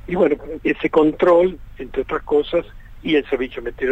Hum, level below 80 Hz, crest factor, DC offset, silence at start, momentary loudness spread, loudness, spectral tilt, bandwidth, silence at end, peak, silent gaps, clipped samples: none; -40 dBFS; 14 dB; under 0.1%; 0.05 s; 12 LU; -19 LUFS; -7.5 dB/octave; 8 kHz; 0 s; -4 dBFS; none; under 0.1%